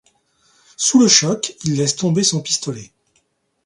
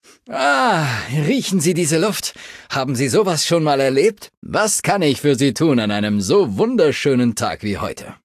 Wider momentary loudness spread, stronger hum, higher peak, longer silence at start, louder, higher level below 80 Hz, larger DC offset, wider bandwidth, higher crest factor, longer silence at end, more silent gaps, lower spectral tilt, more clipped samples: first, 11 LU vs 8 LU; neither; about the same, 0 dBFS vs -2 dBFS; first, 0.8 s vs 0.3 s; about the same, -16 LUFS vs -17 LUFS; second, -60 dBFS vs -50 dBFS; neither; second, 11.5 kHz vs 14.5 kHz; about the same, 20 dB vs 16 dB; first, 0.8 s vs 0.1 s; second, none vs 4.37-4.42 s; about the same, -3.5 dB/octave vs -4.5 dB/octave; neither